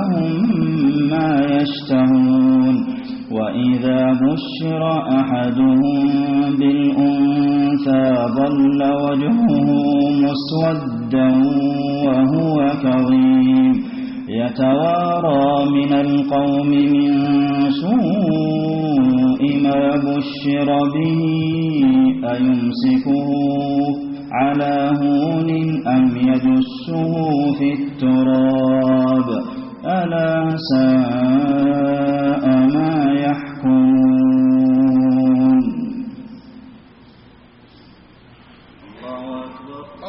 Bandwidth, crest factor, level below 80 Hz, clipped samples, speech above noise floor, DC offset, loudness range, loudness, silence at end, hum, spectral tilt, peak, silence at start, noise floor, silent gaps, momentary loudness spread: 5.8 kHz; 12 dB; -52 dBFS; under 0.1%; 30 dB; under 0.1%; 2 LU; -16 LUFS; 0 s; none; -6.5 dB/octave; -4 dBFS; 0 s; -46 dBFS; none; 8 LU